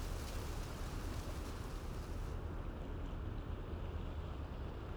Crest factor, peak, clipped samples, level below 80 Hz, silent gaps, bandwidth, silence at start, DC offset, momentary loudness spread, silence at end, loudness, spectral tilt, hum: 14 dB; -30 dBFS; under 0.1%; -46 dBFS; none; over 20 kHz; 0 s; under 0.1%; 2 LU; 0 s; -46 LUFS; -6 dB/octave; none